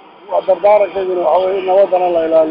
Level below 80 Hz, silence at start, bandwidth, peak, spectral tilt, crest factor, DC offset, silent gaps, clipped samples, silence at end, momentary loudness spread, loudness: -56 dBFS; 0.3 s; 5.2 kHz; -2 dBFS; -8 dB/octave; 10 dB; under 0.1%; none; under 0.1%; 0 s; 5 LU; -13 LUFS